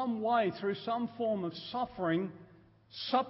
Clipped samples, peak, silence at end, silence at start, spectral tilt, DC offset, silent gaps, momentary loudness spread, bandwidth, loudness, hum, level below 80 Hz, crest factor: under 0.1%; -16 dBFS; 0 s; 0 s; -9.5 dB/octave; under 0.1%; none; 9 LU; 5.8 kHz; -34 LUFS; none; -70 dBFS; 18 dB